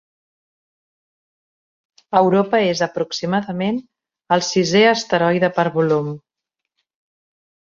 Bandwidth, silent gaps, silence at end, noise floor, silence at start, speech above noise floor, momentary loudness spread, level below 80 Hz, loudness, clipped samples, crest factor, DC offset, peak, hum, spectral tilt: 7.6 kHz; none; 1.45 s; -81 dBFS; 2.1 s; 64 dB; 9 LU; -62 dBFS; -18 LUFS; under 0.1%; 18 dB; under 0.1%; -2 dBFS; none; -5 dB/octave